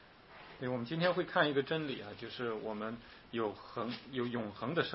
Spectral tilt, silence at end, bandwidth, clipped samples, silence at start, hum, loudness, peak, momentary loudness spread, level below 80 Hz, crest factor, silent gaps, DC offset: -3.5 dB/octave; 0 s; 5.8 kHz; under 0.1%; 0 s; none; -37 LUFS; -14 dBFS; 13 LU; -70 dBFS; 22 dB; none; under 0.1%